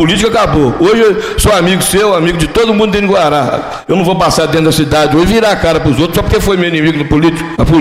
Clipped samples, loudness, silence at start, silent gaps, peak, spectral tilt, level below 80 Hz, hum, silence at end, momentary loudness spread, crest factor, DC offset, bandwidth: under 0.1%; -10 LUFS; 0 s; none; 0 dBFS; -5 dB/octave; -24 dBFS; none; 0 s; 3 LU; 8 dB; under 0.1%; 16 kHz